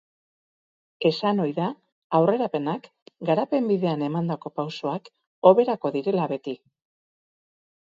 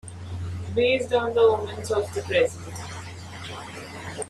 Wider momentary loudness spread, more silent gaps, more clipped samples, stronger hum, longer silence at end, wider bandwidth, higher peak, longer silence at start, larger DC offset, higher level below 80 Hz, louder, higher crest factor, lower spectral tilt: second, 12 LU vs 17 LU; first, 1.92-2.10 s, 3.02-3.06 s, 5.27-5.42 s vs none; neither; neither; first, 1.25 s vs 0 s; second, 7.6 kHz vs 13 kHz; first, -2 dBFS vs -8 dBFS; first, 1 s vs 0.05 s; neither; second, -74 dBFS vs -56 dBFS; about the same, -24 LUFS vs -24 LUFS; first, 24 dB vs 18 dB; first, -8 dB/octave vs -4.5 dB/octave